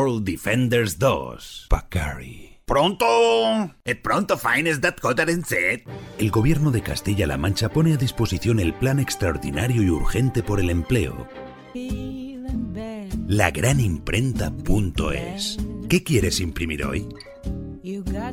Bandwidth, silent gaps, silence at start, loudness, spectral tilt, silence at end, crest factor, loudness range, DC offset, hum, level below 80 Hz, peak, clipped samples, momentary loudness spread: 17.5 kHz; none; 0 s; -22 LUFS; -5.5 dB/octave; 0 s; 18 dB; 4 LU; under 0.1%; none; -34 dBFS; -4 dBFS; under 0.1%; 13 LU